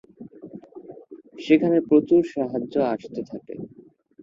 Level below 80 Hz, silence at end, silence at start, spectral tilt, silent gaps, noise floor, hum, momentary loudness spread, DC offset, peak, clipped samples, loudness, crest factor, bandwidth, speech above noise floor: -66 dBFS; 0.55 s; 0.2 s; -8 dB/octave; none; -52 dBFS; none; 25 LU; under 0.1%; -6 dBFS; under 0.1%; -22 LUFS; 18 dB; 7.4 kHz; 30 dB